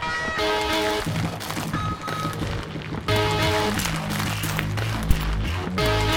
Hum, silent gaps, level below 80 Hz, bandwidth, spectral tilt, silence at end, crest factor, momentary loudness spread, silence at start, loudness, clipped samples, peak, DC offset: none; none; -32 dBFS; over 20 kHz; -4.5 dB/octave; 0 s; 22 dB; 7 LU; 0 s; -25 LUFS; under 0.1%; -2 dBFS; under 0.1%